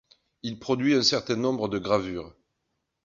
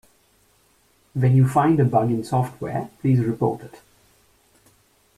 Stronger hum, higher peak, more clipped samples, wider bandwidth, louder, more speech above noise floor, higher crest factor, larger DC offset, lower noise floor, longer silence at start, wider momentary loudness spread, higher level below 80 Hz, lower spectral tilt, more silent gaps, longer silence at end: neither; about the same, -8 dBFS vs -6 dBFS; neither; second, 7.6 kHz vs 12.5 kHz; second, -25 LUFS vs -21 LUFS; first, 53 dB vs 41 dB; about the same, 20 dB vs 18 dB; neither; first, -79 dBFS vs -61 dBFS; second, 0.45 s vs 1.15 s; first, 16 LU vs 12 LU; about the same, -58 dBFS vs -54 dBFS; second, -4.5 dB/octave vs -9 dB/octave; neither; second, 0.75 s vs 1.5 s